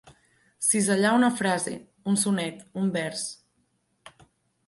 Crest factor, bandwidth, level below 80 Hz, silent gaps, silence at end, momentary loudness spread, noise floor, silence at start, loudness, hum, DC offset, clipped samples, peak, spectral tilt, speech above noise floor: 18 dB; 12 kHz; -70 dBFS; none; 0.6 s; 12 LU; -71 dBFS; 0.05 s; -25 LUFS; none; under 0.1%; under 0.1%; -8 dBFS; -4 dB/octave; 46 dB